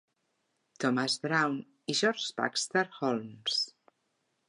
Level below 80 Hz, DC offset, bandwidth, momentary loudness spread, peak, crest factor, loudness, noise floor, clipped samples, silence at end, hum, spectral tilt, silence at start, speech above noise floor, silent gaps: -84 dBFS; under 0.1%; 11.5 kHz; 5 LU; -12 dBFS; 20 dB; -31 LUFS; -78 dBFS; under 0.1%; 0.8 s; none; -3 dB/octave; 0.8 s; 48 dB; none